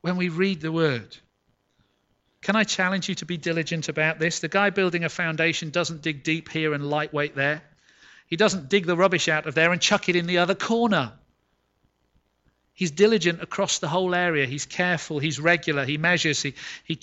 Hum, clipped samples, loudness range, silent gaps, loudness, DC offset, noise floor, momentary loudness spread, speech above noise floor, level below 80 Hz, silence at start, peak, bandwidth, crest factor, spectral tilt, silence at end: none; under 0.1%; 4 LU; none; -23 LUFS; under 0.1%; -70 dBFS; 7 LU; 47 dB; -64 dBFS; 0.05 s; -6 dBFS; 8.2 kHz; 18 dB; -4 dB/octave; 0.05 s